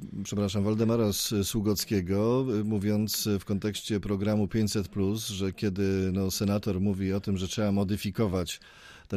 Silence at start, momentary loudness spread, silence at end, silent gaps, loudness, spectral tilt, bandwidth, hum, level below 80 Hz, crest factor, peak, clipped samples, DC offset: 0 s; 5 LU; 0 s; none; -29 LUFS; -5.5 dB/octave; 15.5 kHz; none; -52 dBFS; 14 dB; -14 dBFS; under 0.1%; under 0.1%